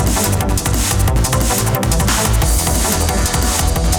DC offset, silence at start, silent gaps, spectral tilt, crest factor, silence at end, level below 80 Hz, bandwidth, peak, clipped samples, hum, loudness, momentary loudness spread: under 0.1%; 0 s; none; -4 dB/octave; 14 dB; 0 s; -18 dBFS; over 20 kHz; 0 dBFS; under 0.1%; none; -15 LUFS; 1 LU